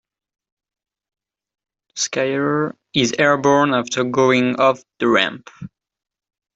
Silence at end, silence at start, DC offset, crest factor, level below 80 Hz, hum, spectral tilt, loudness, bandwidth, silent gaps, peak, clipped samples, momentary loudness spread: 0.9 s; 1.95 s; under 0.1%; 18 dB; -60 dBFS; none; -4 dB/octave; -18 LUFS; 8.2 kHz; none; -2 dBFS; under 0.1%; 8 LU